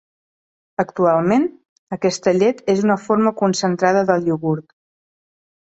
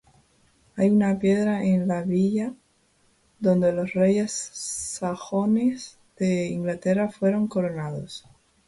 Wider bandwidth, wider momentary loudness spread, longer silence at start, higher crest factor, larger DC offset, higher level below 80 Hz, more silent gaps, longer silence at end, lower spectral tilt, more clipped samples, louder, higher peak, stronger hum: second, 8.2 kHz vs 11.5 kHz; second, 8 LU vs 11 LU; about the same, 0.8 s vs 0.75 s; about the same, 16 dB vs 14 dB; neither; about the same, -60 dBFS vs -60 dBFS; first, 1.69-1.87 s vs none; first, 1.15 s vs 0.5 s; about the same, -6 dB/octave vs -6.5 dB/octave; neither; first, -18 LUFS vs -24 LUFS; first, -2 dBFS vs -10 dBFS; neither